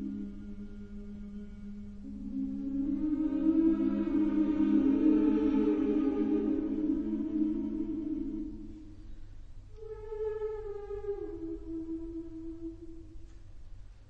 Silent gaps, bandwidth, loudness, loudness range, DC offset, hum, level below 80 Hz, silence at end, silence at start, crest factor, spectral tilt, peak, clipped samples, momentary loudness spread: none; 4.3 kHz; -32 LUFS; 13 LU; under 0.1%; none; -48 dBFS; 0 s; 0 s; 16 dB; -9.5 dB/octave; -16 dBFS; under 0.1%; 19 LU